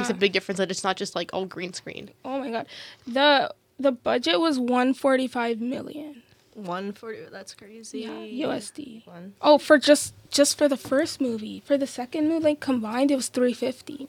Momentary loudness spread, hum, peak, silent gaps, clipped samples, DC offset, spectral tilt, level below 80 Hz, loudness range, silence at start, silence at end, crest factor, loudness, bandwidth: 19 LU; none; -4 dBFS; none; under 0.1%; under 0.1%; -3 dB/octave; -70 dBFS; 11 LU; 0 s; 0 s; 22 dB; -24 LUFS; 17 kHz